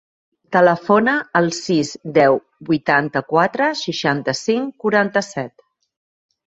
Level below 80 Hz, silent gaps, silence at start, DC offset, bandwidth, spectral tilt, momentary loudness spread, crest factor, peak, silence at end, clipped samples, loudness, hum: -62 dBFS; none; 0.5 s; under 0.1%; 8 kHz; -5 dB/octave; 7 LU; 18 dB; -2 dBFS; 1 s; under 0.1%; -18 LUFS; none